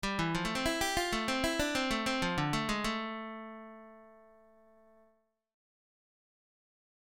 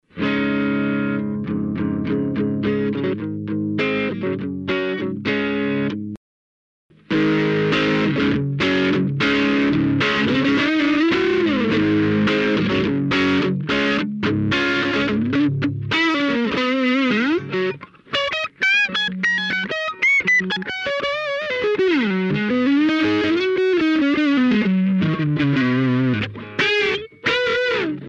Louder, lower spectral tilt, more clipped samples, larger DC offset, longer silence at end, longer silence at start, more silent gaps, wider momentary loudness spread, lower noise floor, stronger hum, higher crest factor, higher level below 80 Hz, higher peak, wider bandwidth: second, -33 LUFS vs -19 LUFS; second, -3.5 dB/octave vs -6.5 dB/octave; neither; neither; first, 2.8 s vs 0 s; about the same, 0.05 s vs 0.15 s; second, none vs 6.17-6.89 s; first, 15 LU vs 6 LU; second, -72 dBFS vs under -90 dBFS; neither; first, 20 dB vs 14 dB; about the same, -52 dBFS vs -50 dBFS; second, -16 dBFS vs -6 dBFS; first, 17 kHz vs 8 kHz